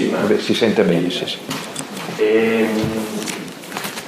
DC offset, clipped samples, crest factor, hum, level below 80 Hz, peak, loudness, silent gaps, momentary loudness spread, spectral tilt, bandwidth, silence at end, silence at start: under 0.1%; under 0.1%; 18 dB; none; -58 dBFS; 0 dBFS; -19 LUFS; none; 12 LU; -4.5 dB/octave; 15.5 kHz; 0 s; 0 s